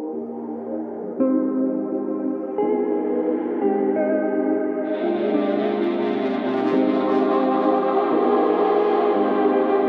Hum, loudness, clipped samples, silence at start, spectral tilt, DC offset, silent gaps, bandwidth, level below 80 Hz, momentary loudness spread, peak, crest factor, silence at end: none; -21 LUFS; under 0.1%; 0 s; -8.5 dB/octave; under 0.1%; none; 5.2 kHz; -72 dBFS; 7 LU; -8 dBFS; 14 dB; 0 s